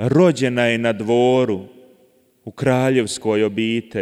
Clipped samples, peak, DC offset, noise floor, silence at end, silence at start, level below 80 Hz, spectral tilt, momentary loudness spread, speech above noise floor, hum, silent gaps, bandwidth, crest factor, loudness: under 0.1%; -4 dBFS; under 0.1%; -57 dBFS; 0 s; 0 s; -58 dBFS; -6 dB/octave; 7 LU; 39 dB; none; none; 14 kHz; 16 dB; -18 LUFS